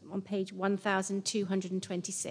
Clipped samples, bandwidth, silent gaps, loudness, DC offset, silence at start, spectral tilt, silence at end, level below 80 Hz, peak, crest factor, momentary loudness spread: under 0.1%; 10.5 kHz; none; -33 LUFS; under 0.1%; 0 s; -4 dB/octave; 0 s; -82 dBFS; -16 dBFS; 18 dB; 5 LU